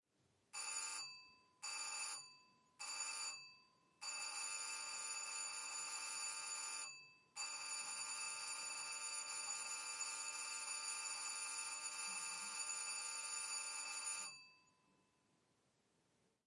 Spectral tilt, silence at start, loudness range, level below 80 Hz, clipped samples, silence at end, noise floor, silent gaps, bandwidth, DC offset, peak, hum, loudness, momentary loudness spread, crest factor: 3 dB/octave; 0.55 s; 3 LU; under -90 dBFS; under 0.1%; 1.85 s; -81 dBFS; none; 12 kHz; under 0.1%; -34 dBFS; none; -45 LUFS; 8 LU; 16 dB